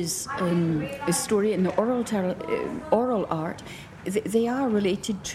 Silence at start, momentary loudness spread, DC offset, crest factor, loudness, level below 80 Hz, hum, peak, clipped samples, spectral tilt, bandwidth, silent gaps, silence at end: 0 s; 6 LU; under 0.1%; 18 dB; -26 LUFS; -56 dBFS; none; -8 dBFS; under 0.1%; -5 dB/octave; 15.5 kHz; none; 0 s